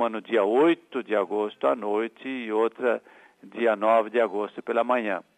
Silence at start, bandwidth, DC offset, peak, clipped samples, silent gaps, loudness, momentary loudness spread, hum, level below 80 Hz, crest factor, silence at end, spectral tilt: 0 s; 9.2 kHz; under 0.1%; -8 dBFS; under 0.1%; none; -25 LUFS; 9 LU; none; -84 dBFS; 16 dB; 0.15 s; -6 dB/octave